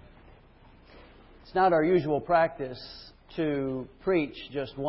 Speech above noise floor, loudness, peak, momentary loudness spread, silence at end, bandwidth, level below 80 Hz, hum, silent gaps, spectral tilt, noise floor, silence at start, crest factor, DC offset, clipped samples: 28 dB; -28 LUFS; -12 dBFS; 17 LU; 0 s; 5.8 kHz; -56 dBFS; none; none; -10.5 dB/octave; -55 dBFS; 0.95 s; 16 dB; under 0.1%; under 0.1%